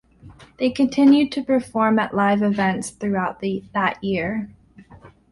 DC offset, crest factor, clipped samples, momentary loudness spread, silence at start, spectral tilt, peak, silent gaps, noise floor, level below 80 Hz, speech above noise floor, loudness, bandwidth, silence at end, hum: under 0.1%; 16 dB; under 0.1%; 11 LU; 0.25 s; -6 dB/octave; -6 dBFS; none; -47 dBFS; -54 dBFS; 27 dB; -20 LUFS; 11.5 kHz; 0.25 s; none